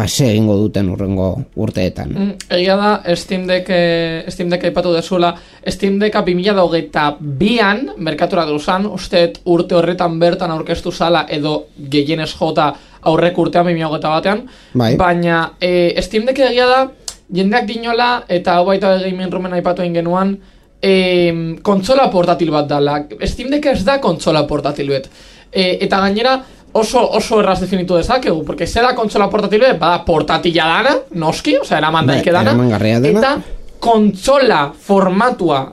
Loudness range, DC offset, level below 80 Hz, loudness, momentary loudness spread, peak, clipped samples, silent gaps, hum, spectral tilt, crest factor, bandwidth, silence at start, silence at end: 3 LU; under 0.1%; -38 dBFS; -14 LUFS; 7 LU; 0 dBFS; under 0.1%; none; none; -5.5 dB/octave; 14 dB; 14 kHz; 0 s; 0 s